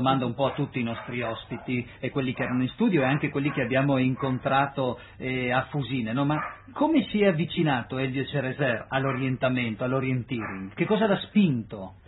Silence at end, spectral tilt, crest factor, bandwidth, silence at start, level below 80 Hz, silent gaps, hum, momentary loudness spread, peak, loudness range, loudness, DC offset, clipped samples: 0.1 s; -11 dB/octave; 18 dB; 4.1 kHz; 0 s; -56 dBFS; none; none; 8 LU; -8 dBFS; 2 LU; -27 LUFS; under 0.1%; under 0.1%